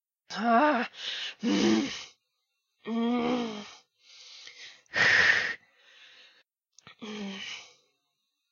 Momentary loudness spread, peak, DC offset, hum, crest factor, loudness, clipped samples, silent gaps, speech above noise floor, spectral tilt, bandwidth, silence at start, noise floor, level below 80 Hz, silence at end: 24 LU; -10 dBFS; under 0.1%; none; 20 dB; -27 LUFS; under 0.1%; none; 53 dB; -3.5 dB/octave; 7.4 kHz; 0.3 s; -81 dBFS; -68 dBFS; 0.85 s